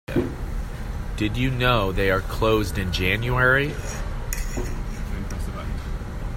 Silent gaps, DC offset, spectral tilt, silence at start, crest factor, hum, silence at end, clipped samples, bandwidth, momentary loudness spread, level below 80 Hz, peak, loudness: none; under 0.1%; -5.5 dB/octave; 0.1 s; 18 dB; none; 0 s; under 0.1%; 16.5 kHz; 13 LU; -30 dBFS; -4 dBFS; -25 LUFS